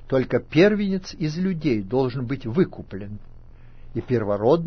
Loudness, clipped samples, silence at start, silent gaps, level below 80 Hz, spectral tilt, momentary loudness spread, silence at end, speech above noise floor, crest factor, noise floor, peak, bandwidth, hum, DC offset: -23 LUFS; under 0.1%; 0 s; none; -44 dBFS; -7.5 dB/octave; 17 LU; 0 s; 20 dB; 18 dB; -42 dBFS; -4 dBFS; 6.6 kHz; none; under 0.1%